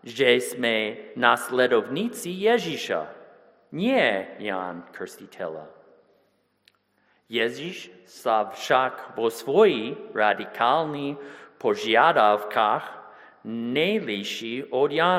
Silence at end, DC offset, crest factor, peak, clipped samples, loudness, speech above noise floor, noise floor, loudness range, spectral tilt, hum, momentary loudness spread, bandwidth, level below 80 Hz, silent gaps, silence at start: 0 s; under 0.1%; 24 dB; -2 dBFS; under 0.1%; -24 LUFS; 43 dB; -67 dBFS; 10 LU; -4 dB/octave; none; 17 LU; 16 kHz; -76 dBFS; none; 0.05 s